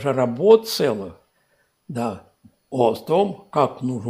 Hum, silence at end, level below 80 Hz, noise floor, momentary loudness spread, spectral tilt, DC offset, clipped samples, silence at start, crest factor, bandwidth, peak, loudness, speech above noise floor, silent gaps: none; 0 s; -66 dBFS; -65 dBFS; 15 LU; -6 dB/octave; under 0.1%; under 0.1%; 0 s; 20 dB; 15.5 kHz; -2 dBFS; -20 LUFS; 45 dB; none